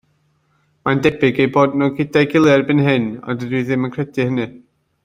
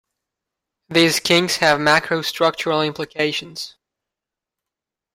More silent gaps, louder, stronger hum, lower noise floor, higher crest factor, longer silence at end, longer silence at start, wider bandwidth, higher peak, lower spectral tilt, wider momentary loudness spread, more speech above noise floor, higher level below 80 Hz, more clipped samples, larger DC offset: neither; about the same, -17 LUFS vs -18 LUFS; neither; second, -62 dBFS vs -86 dBFS; about the same, 16 dB vs 20 dB; second, 0.45 s vs 1.45 s; about the same, 0.85 s vs 0.9 s; second, 10 kHz vs 16 kHz; about the same, -2 dBFS vs -2 dBFS; first, -7 dB/octave vs -3.5 dB/octave; about the same, 10 LU vs 11 LU; second, 46 dB vs 68 dB; first, -54 dBFS vs -62 dBFS; neither; neither